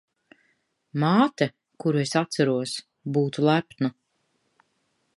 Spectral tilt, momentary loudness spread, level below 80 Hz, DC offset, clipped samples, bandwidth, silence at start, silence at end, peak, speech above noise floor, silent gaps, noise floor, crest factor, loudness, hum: -6 dB/octave; 9 LU; -74 dBFS; under 0.1%; under 0.1%; 11.5 kHz; 0.95 s; 1.25 s; -6 dBFS; 49 dB; none; -72 dBFS; 20 dB; -25 LUFS; none